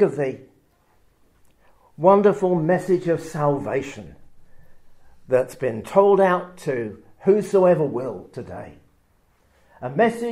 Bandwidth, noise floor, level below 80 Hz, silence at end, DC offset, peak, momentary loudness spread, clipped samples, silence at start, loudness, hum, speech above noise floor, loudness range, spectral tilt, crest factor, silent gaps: 13 kHz; -61 dBFS; -58 dBFS; 0 s; under 0.1%; -2 dBFS; 19 LU; under 0.1%; 0 s; -20 LUFS; none; 41 dB; 4 LU; -7.5 dB/octave; 20 dB; none